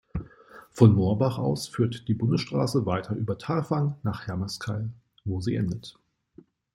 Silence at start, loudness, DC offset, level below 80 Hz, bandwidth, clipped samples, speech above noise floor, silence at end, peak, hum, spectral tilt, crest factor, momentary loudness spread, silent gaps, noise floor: 0.15 s; -26 LUFS; under 0.1%; -52 dBFS; 13 kHz; under 0.1%; 30 dB; 0.85 s; -4 dBFS; none; -7.5 dB/octave; 24 dB; 18 LU; none; -56 dBFS